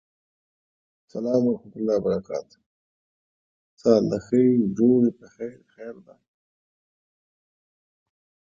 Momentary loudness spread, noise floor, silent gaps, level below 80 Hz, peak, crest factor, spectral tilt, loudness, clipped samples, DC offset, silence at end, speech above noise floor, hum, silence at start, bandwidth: 19 LU; under -90 dBFS; 2.66-3.77 s; -62 dBFS; -4 dBFS; 22 dB; -8.5 dB/octave; -23 LUFS; under 0.1%; under 0.1%; 2.65 s; over 67 dB; none; 1.15 s; 7.4 kHz